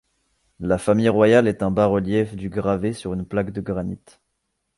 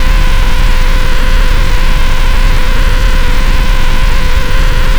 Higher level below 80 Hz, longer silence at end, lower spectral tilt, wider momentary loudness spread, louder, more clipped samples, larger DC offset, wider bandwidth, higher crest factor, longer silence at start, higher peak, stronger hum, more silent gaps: second, -46 dBFS vs -6 dBFS; first, 0.8 s vs 0 s; first, -7 dB/octave vs -4.5 dB/octave; first, 13 LU vs 1 LU; second, -21 LUFS vs -13 LUFS; neither; neither; second, 11.5 kHz vs 15 kHz; first, 18 dB vs 4 dB; first, 0.6 s vs 0 s; second, -4 dBFS vs 0 dBFS; neither; neither